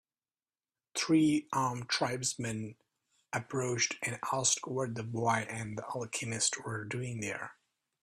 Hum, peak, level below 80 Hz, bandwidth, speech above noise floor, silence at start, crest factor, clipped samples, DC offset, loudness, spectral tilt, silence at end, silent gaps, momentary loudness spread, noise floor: none; -14 dBFS; -70 dBFS; 15 kHz; over 57 dB; 0.95 s; 20 dB; under 0.1%; under 0.1%; -33 LUFS; -3.5 dB/octave; 0.5 s; none; 10 LU; under -90 dBFS